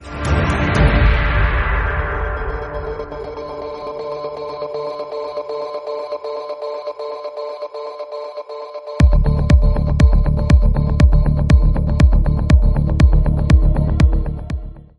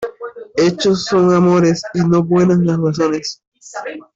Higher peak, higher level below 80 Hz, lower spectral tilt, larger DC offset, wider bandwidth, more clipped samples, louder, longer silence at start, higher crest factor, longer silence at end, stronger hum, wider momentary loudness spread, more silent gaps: first, 0 dBFS vs -4 dBFS; first, -18 dBFS vs -52 dBFS; about the same, -7.5 dB/octave vs -6.5 dB/octave; neither; first, 10 kHz vs 7.8 kHz; neither; second, -18 LUFS vs -14 LUFS; about the same, 0 s vs 0 s; about the same, 14 dB vs 12 dB; about the same, 0.15 s vs 0.15 s; neither; about the same, 14 LU vs 16 LU; second, none vs 3.47-3.52 s